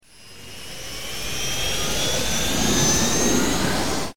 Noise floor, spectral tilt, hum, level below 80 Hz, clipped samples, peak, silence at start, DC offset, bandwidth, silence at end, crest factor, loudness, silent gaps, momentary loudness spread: -43 dBFS; -2.5 dB/octave; none; -38 dBFS; under 0.1%; -6 dBFS; 0 s; 4%; 19.5 kHz; 0 s; 16 dB; -21 LUFS; none; 17 LU